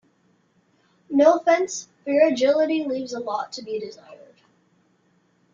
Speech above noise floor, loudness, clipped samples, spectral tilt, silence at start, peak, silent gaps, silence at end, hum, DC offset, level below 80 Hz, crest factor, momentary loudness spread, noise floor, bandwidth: 43 dB; -22 LUFS; under 0.1%; -3.5 dB/octave; 1.1 s; -4 dBFS; none; 1.4 s; none; under 0.1%; -72 dBFS; 20 dB; 14 LU; -64 dBFS; 7.6 kHz